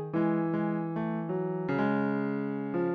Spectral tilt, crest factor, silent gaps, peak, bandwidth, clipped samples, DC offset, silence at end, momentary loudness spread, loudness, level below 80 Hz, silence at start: -10.5 dB/octave; 14 dB; none; -16 dBFS; 4.9 kHz; under 0.1%; under 0.1%; 0 s; 4 LU; -31 LUFS; -68 dBFS; 0 s